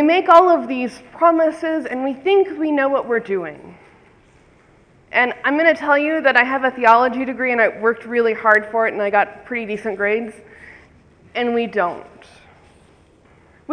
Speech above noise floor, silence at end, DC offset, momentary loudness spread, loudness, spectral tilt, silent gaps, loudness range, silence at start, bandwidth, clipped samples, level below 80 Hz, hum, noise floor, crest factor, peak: 34 dB; 0 s; under 0.1%; 12 LU; -17 LUFS; -5.5 dB/octave; none; 8 LU; 0 s; 10 kHz; under 0.1%; -60 dBFS; none; -52 dBFS; 18 dB; 0 dBFS